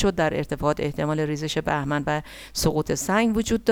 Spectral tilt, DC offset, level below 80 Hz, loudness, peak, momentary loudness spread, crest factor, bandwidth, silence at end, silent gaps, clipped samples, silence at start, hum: -5 dB/octave; under 0.1%; -42 dBFS; -24 LUFS; -6 dBFS; 5 LU; 18 dB; 18 kHz; 0 s; none; under 0.1%; 0 s; none